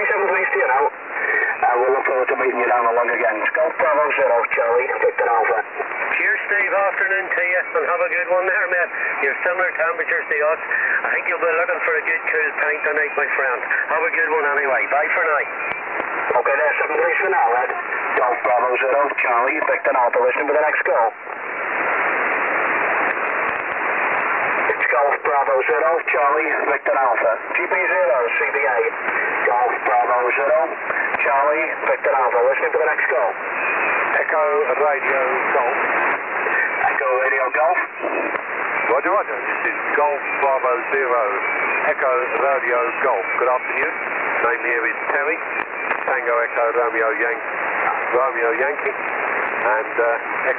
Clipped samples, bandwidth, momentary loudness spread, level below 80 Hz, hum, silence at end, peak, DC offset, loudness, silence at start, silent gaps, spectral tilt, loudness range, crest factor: under 0.1%; 3.9 kHz; 4 LU; -68 dBFS; none; 0 s; -6 dBFS; under 0.1%; -18 LUFS; 0 s; none; -7 dB/octave; 2 LU; 14 dB